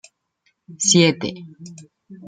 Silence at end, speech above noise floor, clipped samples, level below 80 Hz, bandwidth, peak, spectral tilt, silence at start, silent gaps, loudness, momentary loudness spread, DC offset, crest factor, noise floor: 0 s; 48 dB; under 0.1%; -64 dBFS; 9.8 kHz; -2 dBFS; -3.5 dB/octave; 0.7 s; none; -17 LUFS; 26 LU; under 0.1%; 20 dB; -68 dBFS